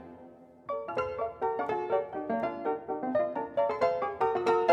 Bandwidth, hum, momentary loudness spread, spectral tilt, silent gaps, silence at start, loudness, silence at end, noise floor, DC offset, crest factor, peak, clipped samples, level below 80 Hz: 9.4 kHz; none; 9 LU; -6.5 dB/octave; none; 0 s; -31 LUFS; 0 s; -52 dBFS; under 0.1%; 20 dB; -10 dBFS; under 0.1%; -66 dBFS